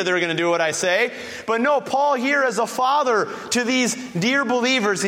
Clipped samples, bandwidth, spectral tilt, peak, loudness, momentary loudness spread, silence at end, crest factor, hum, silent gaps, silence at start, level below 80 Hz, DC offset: under 0.1%; 16 kHz; -3 dB/octave; -6 dBFS; -20 LUFS; 4 LU; 0 s; 14 dB; none; none; 0 s; -66 dBFS; under 0.1%